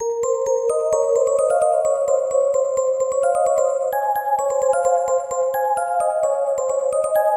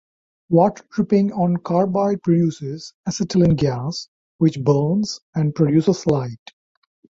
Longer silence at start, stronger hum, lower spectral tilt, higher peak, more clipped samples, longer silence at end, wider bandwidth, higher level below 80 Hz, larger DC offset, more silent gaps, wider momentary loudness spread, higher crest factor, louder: second, 0 s vs 0.5 s; neither; second, -2 dB/octave vs -7.5 dB/octave; second, -6 dBFS vs -2 dBFS; neither; second, 0 s vs 0.85 s; first, 12.5 kHz vs 7.8 kHz; second, -60 dBFS vs -50 dBFS; neither; second, none vs 2.94-3.04 s, 4.08-4.39 s, 5.22-5.33 s; second, 3 LU vs 11 LU; second, 12 dB vs 18 dB; about the same, -19 LUFS vs -19 LUFS